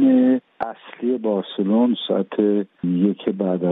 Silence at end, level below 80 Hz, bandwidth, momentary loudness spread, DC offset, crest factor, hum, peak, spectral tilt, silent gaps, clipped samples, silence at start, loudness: 0 s; -68 dBFS; 4 kHz; 9 LU; under 0.1%; 14 dB; none; -6 dBFS; -11 dB/octave; none; under 0.1%; 0 s; -21 LUFS